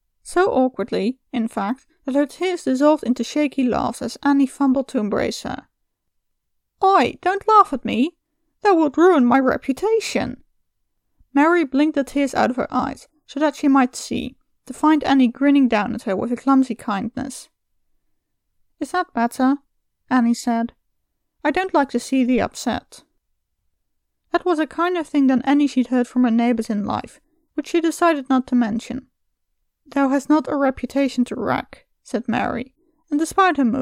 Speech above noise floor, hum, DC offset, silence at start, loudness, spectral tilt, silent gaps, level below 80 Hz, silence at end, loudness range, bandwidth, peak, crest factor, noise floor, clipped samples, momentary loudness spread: 54 dB; none; under 0.1%; 0.25 s; -20 LUFS; -5 dB/octave; none; -52 dBFS; 0 s; 5 LU; 14.5 kHz; -2 dBFS; 18 dB; -72 dBFS; under 0.1%; 11 LU